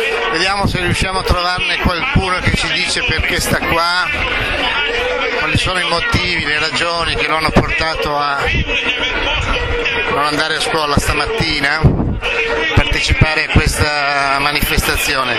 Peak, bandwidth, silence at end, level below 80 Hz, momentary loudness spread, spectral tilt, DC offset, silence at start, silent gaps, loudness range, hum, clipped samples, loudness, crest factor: 0 dBFS; 16 kHz; 0 s; -24 dBFS; 3 LU; -4 dB/octave; under 0.1%; 0 s; none; 1 LU; none; under 0.1%; -14 LUFS; 16 dB